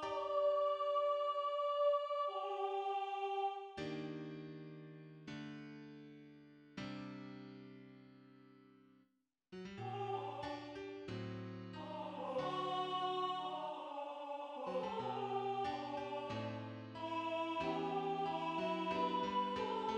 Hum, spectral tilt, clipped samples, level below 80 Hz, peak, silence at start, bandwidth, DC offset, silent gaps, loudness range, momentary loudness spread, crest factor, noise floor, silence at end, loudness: none; -6 dB/octave; under 0.1%; -76 dBFS; -26 dBFS; 0 s; 9.4 kHz; under 0.1%; none; 14 LU; 17 LU; 16 dB; -80 dBFS; 0 s; -41 LUFS